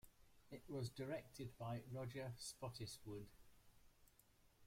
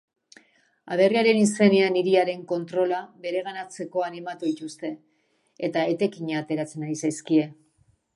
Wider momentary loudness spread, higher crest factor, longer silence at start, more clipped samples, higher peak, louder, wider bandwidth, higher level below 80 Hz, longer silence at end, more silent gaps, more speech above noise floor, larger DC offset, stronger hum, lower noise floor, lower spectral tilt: second, 8 LU vs 14 LU; about the same, 16 dB vs 20 dB; second, 0.05 s vs 0.85 s; neither; second, -36 dBFS vs -4 dBFS; second, -52 LUFS vs -25 LUFS; first, 16.5 kHz vs 11.5 kHz; about the same, -72 dBFS vs -72 dBFS; second, 0 s vs 0.65 s; neither; second, 23 dB vs 44 dB; neither; neither; first, -74 dBFS vs -68 dBFS; about the same, -5 dB/octave vs -5 dB/octave